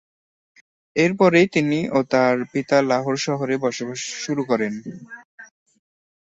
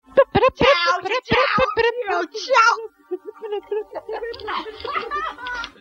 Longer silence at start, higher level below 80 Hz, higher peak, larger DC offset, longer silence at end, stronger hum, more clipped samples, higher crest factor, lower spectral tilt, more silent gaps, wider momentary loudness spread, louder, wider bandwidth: first, 0.95 s vs 0.15 s; second, -62 dBFS vs -46 dBFS; about the same, -4 dBFS vs -2 dBFS; neither; first, 0.75 s vs 0.1 s; neither; neither; about the same, 18 dB vs 20 dB; about the same, -5 dB/octave vs -4 dB/octave; first, 5.25-5.38 s vs none; about the same, 15 LU vs 15 LU; about the same, -20 LUFS vs -20 LUFS; about the same, 8.2 kHz vs 7.6 kHz